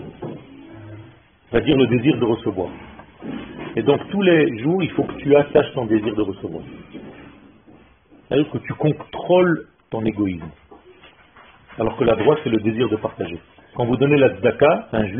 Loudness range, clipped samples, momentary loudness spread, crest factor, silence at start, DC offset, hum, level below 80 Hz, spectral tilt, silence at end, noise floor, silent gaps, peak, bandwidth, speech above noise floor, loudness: 4 LU; under 0.1%; 21 LU; 18 dB; 0 s; under 0.1%; none; -48 dBFS; -5.5 dB/octave; 0 s; -51 dBFS; none; -2 dBFS; 3.8 kHz; 32 dB; -19 LUFS